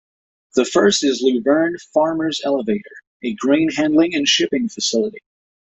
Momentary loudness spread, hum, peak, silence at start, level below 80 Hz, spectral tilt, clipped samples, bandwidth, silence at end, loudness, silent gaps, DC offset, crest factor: 8 LU; none; -2 dBFS; 0.55 s; -60 dBFS; -3.5 dB/octave; under 0.1%; 8.2 kHz; 0.55 s; -18 LUFS; 3.07-3.20 s; under 0.1%; 16 dB